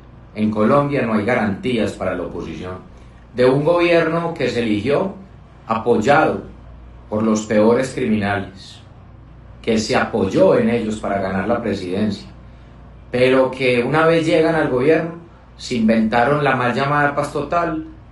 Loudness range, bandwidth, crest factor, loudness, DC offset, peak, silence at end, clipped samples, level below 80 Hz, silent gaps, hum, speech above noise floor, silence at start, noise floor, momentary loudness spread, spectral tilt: 3 LU; 11.5 kHz; 16 dB; -18 LUFS; under 0.1%; -2 dBFS; 0 s; under 0.1%; -44 dBFS; none; 60 Hz at -45 dBFS; 24 dB; 0.15 s; -41 dBFS; 14 LU; -6 dB/octave